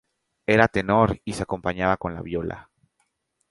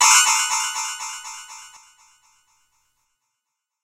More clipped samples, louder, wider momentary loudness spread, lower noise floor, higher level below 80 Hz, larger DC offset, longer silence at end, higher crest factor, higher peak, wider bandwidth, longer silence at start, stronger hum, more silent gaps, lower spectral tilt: neither; second, -23 LUFS vs -18 LUFS; second, 13 LU vs 24 LU; second, -73 dBFS vs -81 dBFS; first, -46 dBFS vs -70 dBFS; neither; second, 0.9 s vs 2.15 s; about the same, 24 dB vs 22 dB; about the same, 0 dBFS vs -2 dBFS; second, 11.5 kHz vs 16 kHz; first, 0.5 s vs 0 s; neither; neither; first, -6.5 dB/octave vs 5.5 dB/octave